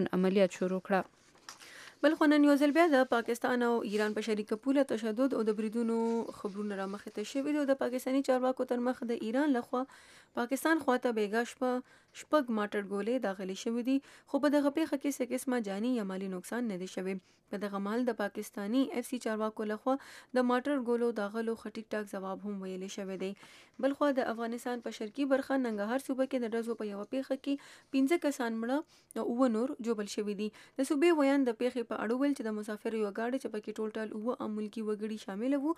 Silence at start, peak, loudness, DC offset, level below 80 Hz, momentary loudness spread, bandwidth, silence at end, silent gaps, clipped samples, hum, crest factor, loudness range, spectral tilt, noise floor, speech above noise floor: 0 s; -14 dBFS; -33 LUFS; under 0.1%; -80 dBFS; 11 LU; 15 kHz; 0.05 s; none; under 0.1%; none; 18 dB; 7 LU; -5.5 dB/octave; -54 dBFS; 21 dB